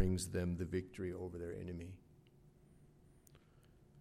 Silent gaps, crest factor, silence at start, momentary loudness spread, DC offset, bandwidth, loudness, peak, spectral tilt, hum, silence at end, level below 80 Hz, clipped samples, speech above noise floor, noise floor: none; 22 dB; 0 s; 15 LU; under 0.1%; 15 kHz; -43 LUFS; -22 dBFS; -6 dB/octave; none; 0 s; -58 dBFS; under 0.1%; 24 dB; -66 dBFS